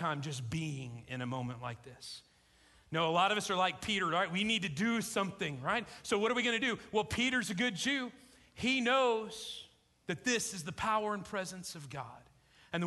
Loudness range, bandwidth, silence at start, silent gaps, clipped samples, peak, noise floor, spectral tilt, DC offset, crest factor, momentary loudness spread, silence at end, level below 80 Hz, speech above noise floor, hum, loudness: 5 LU; 12 kHz; 0 s; none; under 0.1%; -18 dBFS; -65 dBFS; -3.5 dB/octave; under 0.1%; 18 dB; 15 LU; 0 s; -64 dBFS; 31 dB; none; -34 LUFS